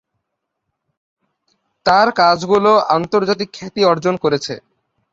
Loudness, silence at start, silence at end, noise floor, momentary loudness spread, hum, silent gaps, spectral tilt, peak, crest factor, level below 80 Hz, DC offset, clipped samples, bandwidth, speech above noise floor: -15 LUFS; 1.85 s; 0.55 s; -76 dBFS; 9 LU; none; none; -5 dB/octave; 0 dBFS; 16 dB; -56 dBFS; under 0.1%; under 0.1%; 7.8 kHz; 62 dB